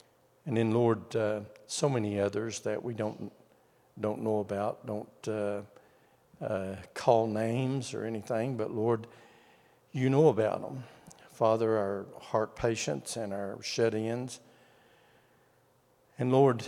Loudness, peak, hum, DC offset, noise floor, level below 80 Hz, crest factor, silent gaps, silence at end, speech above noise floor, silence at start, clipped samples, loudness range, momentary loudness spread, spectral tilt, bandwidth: -31 LUFS; -10 dBFS; none; under 0.1%; -67 dBFS; -70 dBFS; 22 dB; none; 0 s; 36 dB; 0.45 s; under 0.1%; 6 LU; 13 LU; -6 dB/octave; 15 kHz